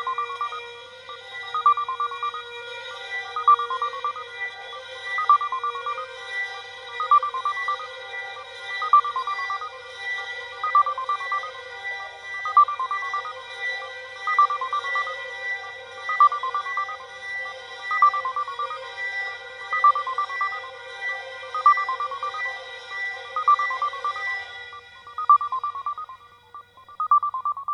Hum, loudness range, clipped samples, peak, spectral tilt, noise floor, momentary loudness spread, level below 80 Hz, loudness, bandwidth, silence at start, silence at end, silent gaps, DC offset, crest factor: none; 3 LU; under 0.1%; -6 dBFS; 0 dB/octave; -46 dBFS; 16 LU; -72 dBFS; -24 LUFS; 9.8 kHz; 0 s; 0 s; none; under 0.1%; 18 dB